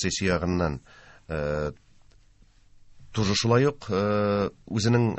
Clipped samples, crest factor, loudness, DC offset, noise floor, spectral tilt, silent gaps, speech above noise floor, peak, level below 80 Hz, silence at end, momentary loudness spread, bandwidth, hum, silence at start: under 0.1%; 18 dB; -26 LUFS; under 0.1%; -57 dBFS; -5.5 dB/octave; none; 32 dB; -8 dBFS; -44 dBFS; 0 s; 11 LU; 8.4 kHz; none; 0 s